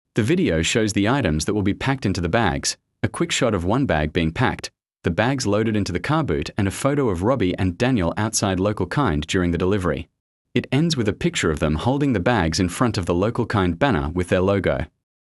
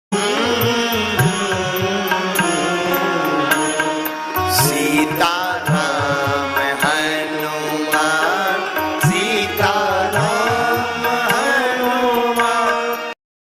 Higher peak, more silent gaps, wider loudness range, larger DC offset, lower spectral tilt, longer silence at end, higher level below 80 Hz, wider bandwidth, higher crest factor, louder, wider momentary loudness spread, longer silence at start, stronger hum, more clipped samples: about the same, -4 dBFS vs -4 dBFS; first, 10.20-10.45 s vs none; about the same, 1 LU vs 1 LU; neither; first, -5.5 dB/octave vs -3.5 dB/octave; about the same, 0.35 s vs 0.3 s; first, -42 dBFS vs -52 dBFS; second, 12 kHz vs 16 kHz; about the same, 18 dB vs 14 dB; second, -21 LUFS vs -17 LUFS; about the same, 5 LU vs 5 LU; about the same, 0.15 s vs 0.1 s; neither; neither